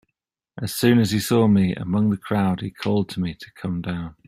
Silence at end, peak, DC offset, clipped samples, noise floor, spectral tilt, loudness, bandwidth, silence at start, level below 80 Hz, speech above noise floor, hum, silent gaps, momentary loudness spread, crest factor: 0.15 s; -4 dBFS; under 0.1%; under 0.1%; -80 dBFS; -6.5 dB/octave; -22 LUFS; 16 kHz; 0.55 s; -52 dBFS; 59 dB; none; none; 12 LU; 18 dB